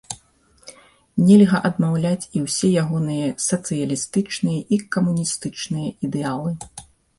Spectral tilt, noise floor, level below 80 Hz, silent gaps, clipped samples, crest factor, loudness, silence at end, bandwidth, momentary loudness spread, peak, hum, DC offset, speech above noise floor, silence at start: -5.5 dB/octave; -56 dBFS; -56 dBFS; none; under 0.1%; 18 dB; -20 LUFS; 0.35 s; 11.5 kHz; 14 LU; -2 dBFS; none; under 0.1%; 37 dB; 0.1 s